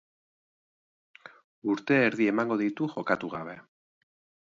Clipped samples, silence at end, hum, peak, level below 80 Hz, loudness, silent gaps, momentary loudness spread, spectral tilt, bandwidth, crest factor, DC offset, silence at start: under 0.1%; 0.9 s; none; -10 dBFS; -74 dBFS; -28 LUFS; 1.44-1.62 s; 14 LU; -7 dB/octave; 7.6 kHz; 22 dB; under 0.1%; 1.25 s